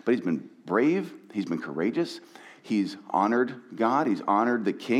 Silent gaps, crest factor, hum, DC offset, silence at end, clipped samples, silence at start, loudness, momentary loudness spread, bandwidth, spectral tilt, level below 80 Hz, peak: none; 18 dB; none; under 0.1%; 0 s; under 0.1%; 0.05 s; -27 LUFS; 9 LU; 11.5 kHz; -6.5 dB/octave; -86 dBFS; -10 dBFS